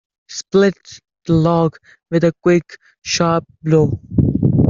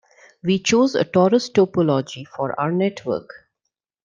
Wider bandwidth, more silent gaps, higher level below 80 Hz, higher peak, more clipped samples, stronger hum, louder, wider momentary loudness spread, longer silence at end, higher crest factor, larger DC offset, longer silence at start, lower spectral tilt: second, 7.6 kHz vs 9.2 kHz; neither; first, -40 dBFS vs -62 dBFS; first, 0 dBFS vs -4 dBFS; neither; neither; first, -16 LUFS vs -20 LUFS; first, 15 LU vs 11 LU; second, 0 s vs 0.7 s; about the same, 16 dB vs 18 dB; neither; second, 0.3 s vs 0.45 s; about the same, -6.5 dB/octave vs -5.5 dB/octave